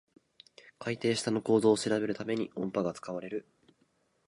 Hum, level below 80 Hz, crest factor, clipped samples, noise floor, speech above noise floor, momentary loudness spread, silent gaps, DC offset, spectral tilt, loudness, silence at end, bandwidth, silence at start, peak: none; -72 dBFS; 20 dB; under 0.1%; -72 dBFS; 42 dB; 14 LU; none; under 0.1%; -5 dB/octave; -31 LUFS; 0.85 s; 11.5 kHz; 0.65 s; -12 dBFS